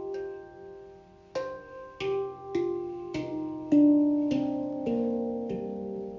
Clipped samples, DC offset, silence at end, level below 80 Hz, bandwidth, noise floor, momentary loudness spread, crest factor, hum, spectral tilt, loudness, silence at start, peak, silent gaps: under 0.1%; under 0.1%; 0 s; -62 dBFS; 7.2 kHz; -52 dBFS; 21 LU; 16 dB; none; -7.5 dB/octave; -29 LUFS; 0 s; -14 dBFS; none